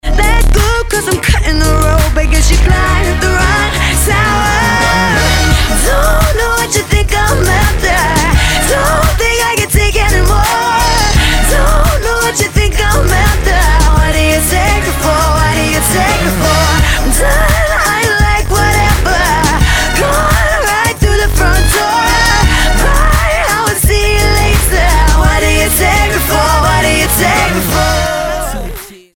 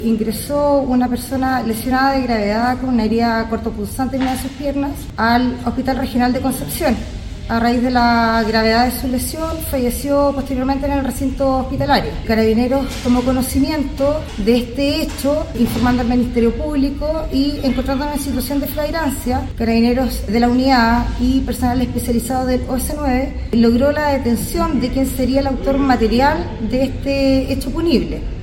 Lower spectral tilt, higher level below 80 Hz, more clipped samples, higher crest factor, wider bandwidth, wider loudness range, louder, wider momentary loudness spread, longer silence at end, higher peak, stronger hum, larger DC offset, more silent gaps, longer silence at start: second, -3.5 dB/octave vs -5.5 dB/octave; first, -12 dBFS vs -28 dBFS; neither; second, 10 dB vs 16 dB; about the same, 18.5 kHz vs 17 kHz; about the same, 1 LU vs 2 LU; first, -10 LUFS vs -17 LUFS; second, 2 LU vs 6 LU; first, 0.2 s vs 0 s; about the same, 0 dBFS vs 0 dBFS; neither; neither; neither; about the same, 0.05 s vs 0 s